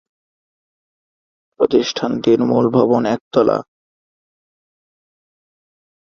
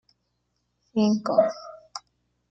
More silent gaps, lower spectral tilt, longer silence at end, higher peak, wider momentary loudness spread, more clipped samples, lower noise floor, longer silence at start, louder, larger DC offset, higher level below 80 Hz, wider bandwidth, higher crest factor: first, 3.21-3.31 s vs none; about the same, -6.5 dB/octave vs -6.5 dB/octave; first, 2.5 s vs 0.55 s; first, 0 dBFS vs -6 dBFS; second, 6 LU vs 19 LU; neither; first, under -90 dBFS vs -75 dBFS; first, 1.6 s vs 0.95 s; first, -16 LUFS vs -24 LUFS; neither; first, -58 dBFS vs -70 dBFS; second, 7.2 kHz vs 8 kHz; about the same, 20 dB vs 22 dB